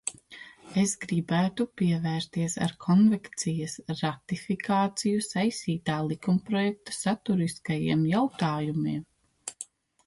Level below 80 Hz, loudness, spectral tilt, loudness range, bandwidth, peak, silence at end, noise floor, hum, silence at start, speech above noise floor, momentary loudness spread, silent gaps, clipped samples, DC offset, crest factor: -64 dBFS; -28 LUFS; -5.5 dB/octave; 2 LU; 11.5 kHz; -14 dBFS; 0.45 s; -49 dBFS; none; 0.05 s; 22 dB; 12 LU; none; under 0.1%; under 0.1%; 14 dB